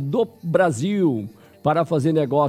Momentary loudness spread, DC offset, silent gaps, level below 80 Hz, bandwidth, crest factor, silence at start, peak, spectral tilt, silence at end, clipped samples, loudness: 6 LU; under 0.1%; none; -64 dBFS; 14.5 kHz; 16 dB; 0 s; -6 dBFS; -7 dB/octave; 0 s; under 0.1%; -21 LUFS